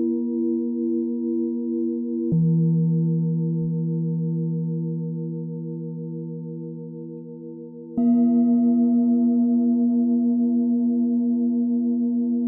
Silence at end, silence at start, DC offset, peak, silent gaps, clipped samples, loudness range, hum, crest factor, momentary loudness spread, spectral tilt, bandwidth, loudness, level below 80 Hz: 0 s; 0 s; under 0.1%; -12 dBFS; none; under 0.1%; 9 LU; none; 10 dB; 14 LU; -16.5 dB/octave; 1.3 kHz; -22 LUFS; -68 dBFS